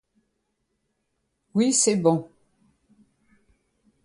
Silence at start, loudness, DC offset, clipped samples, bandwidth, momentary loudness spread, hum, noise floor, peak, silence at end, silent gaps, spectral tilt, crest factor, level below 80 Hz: 1.55 s; -22 LUFS; under 0.1%; under 0.1%; 11.5 kHz; 9 LU; none; -76 dBFS; -6 dBFS; 1.8 s; none; -4 dB/octave; 22 dB; -70 dBFS